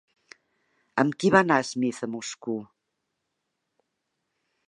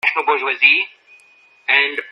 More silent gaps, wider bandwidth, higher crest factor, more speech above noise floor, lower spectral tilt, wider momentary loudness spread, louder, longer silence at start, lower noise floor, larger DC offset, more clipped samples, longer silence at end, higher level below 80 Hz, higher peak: neither; about the same, 11.5 kHz vs 10.5 kHz; first, 26 dB vs 18 dB; first, 56 dB vs 34 dB; first, -5 dB/octave vs -1 dB/octave; about the same, 14 LU vs 12 LU; second, -25 LUFS vs -14 LUFS; first, 0.95 s vs 0.05 s; first, -80 dBFS vs -51 dBFS; neither; neither; first, 2.05 s vs 0 s; first, -68 dBFS vs -78 dBFS; about the same, -2 dBFS vs 0 dBFS